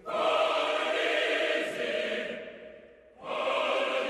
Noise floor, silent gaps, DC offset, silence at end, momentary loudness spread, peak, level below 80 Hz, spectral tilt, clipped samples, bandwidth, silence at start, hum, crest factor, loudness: -53 dBFS; none; under 0.1%; 0 s; 17 LU; -16 dBFS; -72 dBFS; -2 dB/octave; under 0.1%; 13 kHz; 0 s; none; 14 dB; -29 LUFS